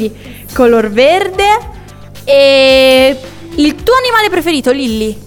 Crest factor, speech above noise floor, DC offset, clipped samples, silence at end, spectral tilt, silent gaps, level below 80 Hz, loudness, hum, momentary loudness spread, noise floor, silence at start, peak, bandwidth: 10 dB; 21 dB; under 0.1%; under 0.1%; 0 s; -4 dB/octave; none; -34 dBFS; -9 LUFS; none; 16 LU; -31 dBFS; 0 s; 0 dBFS; 19.5 kHz